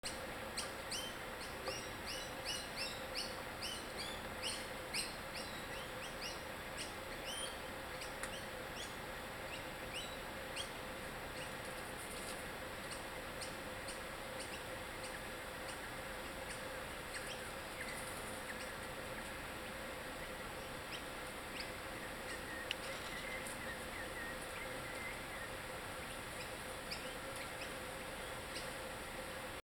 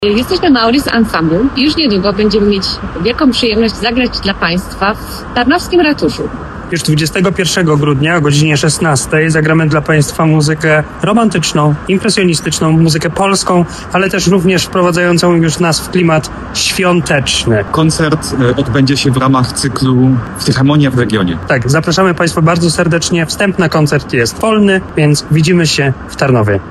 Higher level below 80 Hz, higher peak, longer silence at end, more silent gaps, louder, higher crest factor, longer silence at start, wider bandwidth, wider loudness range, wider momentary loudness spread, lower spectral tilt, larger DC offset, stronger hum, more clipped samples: second, -60 dBFS vs -32 dBFS; second, -20 dBFS vs 0 dBFS; about the same, 0.1 s vs 0 s; neither; second, -45 LUFS vs -11 LUFS; first, 26 dB vs 10 dB; about the same, 0.05 s vs 0 s; first, 19 kHz vs 13 kHz; about the same, 3 LU vs 2 LU; about the same, 4 LU vs 4 LU; second, -2.5 dB/octave vs -5 dB/octave; neither; neither; neither